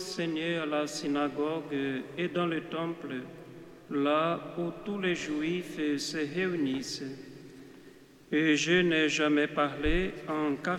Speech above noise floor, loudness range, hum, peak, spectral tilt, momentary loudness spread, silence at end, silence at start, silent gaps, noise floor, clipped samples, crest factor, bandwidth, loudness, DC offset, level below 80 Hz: 24 dB; 5 LU; none; -14 dBFS; -4.5 dB/octave; 15 LU; 0 s; 0 s; none; -54 dBFS; under 0.1%; 18 dB; 14 kHz; -30 LUFS; under 0.1%; -48 dBFS